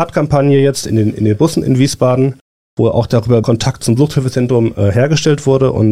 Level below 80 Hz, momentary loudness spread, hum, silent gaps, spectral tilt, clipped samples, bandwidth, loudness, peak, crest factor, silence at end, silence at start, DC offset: -40 dBFS; 4 LU; none; 2.41-2.77 s; -6.5 dB/octave; under 0.1%; 14.5 kHz; -13 LUFS; 0 dBFS; 10 dB; 0 s; 0 s; 1%